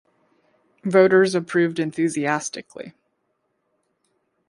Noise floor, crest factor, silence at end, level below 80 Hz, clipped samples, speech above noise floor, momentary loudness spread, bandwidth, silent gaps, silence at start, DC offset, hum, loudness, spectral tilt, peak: -72 dBFS; 20 dB; 1.6 s; -70 dBFS; under 0.1%; 52 dB; 22 LU; 11.5 kHz; none; 0.85 s; under 0.1%; none; -20 LUFS; -5.5 dB/octave; -2 dBFS